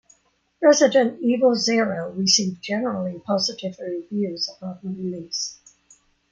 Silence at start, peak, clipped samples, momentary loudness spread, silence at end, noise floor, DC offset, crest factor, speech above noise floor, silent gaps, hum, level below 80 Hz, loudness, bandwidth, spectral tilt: 0.6 s; -4 dBFS; under 0.1%; 13 LU; 0.8 s; -60 dBFS; under 0.1%; 20 dB; 38 dB; none; 60 Hz at -50 dBFS; -68 dBFS; -22 LUFS; 9.2 kHz; -3.5 dB/octave